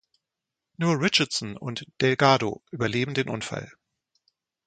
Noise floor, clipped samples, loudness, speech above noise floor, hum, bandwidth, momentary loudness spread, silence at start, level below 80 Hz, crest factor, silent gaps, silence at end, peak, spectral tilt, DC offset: -87 dBFS; under 0.1%; -25 LUFS; 61 dB; none; 9.4 kHz; 14 LU; 0.8 s; -62 dBFS; 24 dB; none; 1 s; -4 dBFS; -4.5 dB/octave; under 0.1%